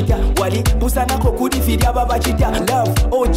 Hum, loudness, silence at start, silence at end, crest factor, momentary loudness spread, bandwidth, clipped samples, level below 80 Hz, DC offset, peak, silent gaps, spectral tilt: none; -17 LUFS; 0 s; 0 s; 8 dB; 1 LU; 16.5 kHz; under 0.1%; -18 dBFS; under 0.1%; -6 dBFS; none; -5.5 dB/octave